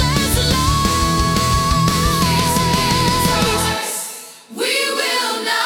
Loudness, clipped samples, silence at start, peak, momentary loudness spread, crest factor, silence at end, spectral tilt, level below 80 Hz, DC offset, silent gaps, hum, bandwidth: -16 LUFS; under 0.1%; 0 s; -2 dBFS; 7 LU; 14 dB; 0 s; -3.5 dB/octave; -28 dBFS; under 0.1%; none; none; 18 kHz